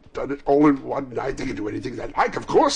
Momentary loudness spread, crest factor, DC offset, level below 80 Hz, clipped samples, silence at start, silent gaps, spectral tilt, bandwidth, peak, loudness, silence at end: 11 LU; 14 dB; under 0.1%; -42 dBFS; under 0.1%; 0.15 s; none; -5.5 dB/octave; 10 kHz; -8 dBFS; -23 LUFS; 0 s